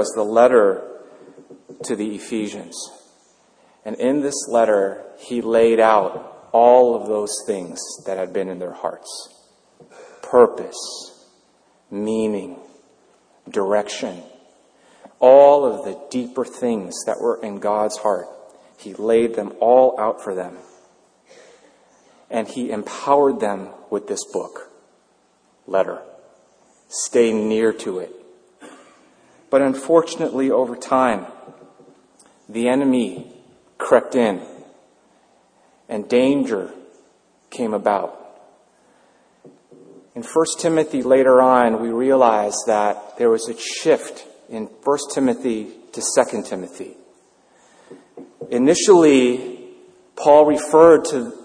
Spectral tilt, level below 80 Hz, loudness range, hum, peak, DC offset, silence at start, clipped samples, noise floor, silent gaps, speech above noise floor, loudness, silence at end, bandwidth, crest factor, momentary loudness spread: -4 dB/octave; -64 dBFS; 9 LU; none; 0 dBFS; under 0.1%; 0 s; under 0.1%; -60 dBFS; none; 42 dB; -18 LUFS; 0 s; 10.5 kHz; 20 dB; 20 LU